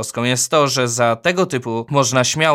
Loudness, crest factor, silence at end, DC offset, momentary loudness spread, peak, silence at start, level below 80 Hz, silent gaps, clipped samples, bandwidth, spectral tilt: -17 LUFS; 16 dB; 0 s; under 0.1%; 5 LU; 0 dBFS; 0 s; -60 dBFS; none; under 0.1%; 16.5 kHz; -3.5 dB/octave